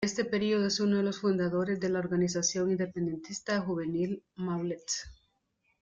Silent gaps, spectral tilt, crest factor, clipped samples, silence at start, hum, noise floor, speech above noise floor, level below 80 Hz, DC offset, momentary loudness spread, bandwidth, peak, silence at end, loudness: none; -4.5 dB/octave; 14 dB; under 0.1%; 0 s; none; -76 dBFS; 45 dB; -64 dBFS; under 0.1%; 7 LU; 7.8 kHz; -16 dBFS; 0.7 s; -31 LUFS